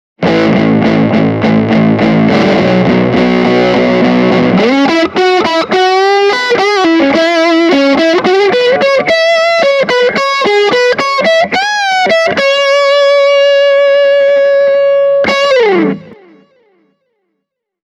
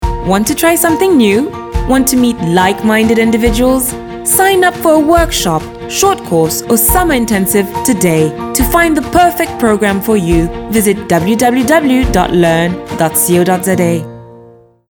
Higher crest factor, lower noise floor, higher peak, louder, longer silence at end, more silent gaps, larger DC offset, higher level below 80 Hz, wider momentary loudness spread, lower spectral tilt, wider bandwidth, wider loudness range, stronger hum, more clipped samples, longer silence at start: about the same, 8 dB vs 10 dB; first, -71 dBFS vs -40 dBFS; about the same, 0 dBFS vs 0 dBFS; about the same, -9 LUFS vs -11 LUFS; first, 1.75 s vs 0.45 s; neither; neither; second, -44 dBFS vs -26 dBFS; about the same, 3 LU vs 5 LU; about the same, -5.5 dB/octave vs -4.5 dB/octave; second, 10.5 kHz vs 19.5 kHz; about the same, 1 LU vs 1 LU; neither; neither; first, 0.2 s vs 0 s